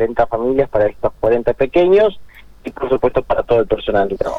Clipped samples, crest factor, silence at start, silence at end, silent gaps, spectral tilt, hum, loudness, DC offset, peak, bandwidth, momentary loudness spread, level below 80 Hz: under 0.1%; 14 dB; 0 s; 0 s; none; -7.5 dB/octave; none; -16 LUFS; under 0.1%; -2 dBFS; 7.2 kHz; 7 LU; -36 dBFS